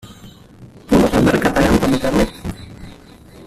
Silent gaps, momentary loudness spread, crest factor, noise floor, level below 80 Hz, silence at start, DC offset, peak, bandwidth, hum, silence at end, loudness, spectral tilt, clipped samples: none; 16 LU; 16 dB; -41 dBFS; -32 dBFS; 0.05 s; under 0.1%; -2 dBFS; 15 kHz; none; 0.05 s; -15 LUFS; -6 dB/octave; under 0.1%